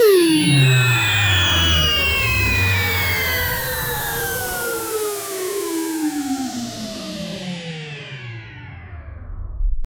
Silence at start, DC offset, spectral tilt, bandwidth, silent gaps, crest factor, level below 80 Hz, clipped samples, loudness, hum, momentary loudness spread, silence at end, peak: 0 s; under 0.1%; -4 dB/octave; over 20 kHz; none; 16 dB; -32 dBFS; under 0.1%; -18 LUFS; none; 20 LU; 0.15 s; -4 dBFS